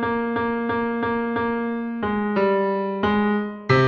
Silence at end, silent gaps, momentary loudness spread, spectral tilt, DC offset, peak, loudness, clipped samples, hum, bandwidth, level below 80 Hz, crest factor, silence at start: 0 s; none; 5 LU; -8 dB/octave; under 0.1%; -6 dBFS; -23 LUFS; under 0.1%; none; 6.8 kHz; -52 dBFS; 16 dB; 0 s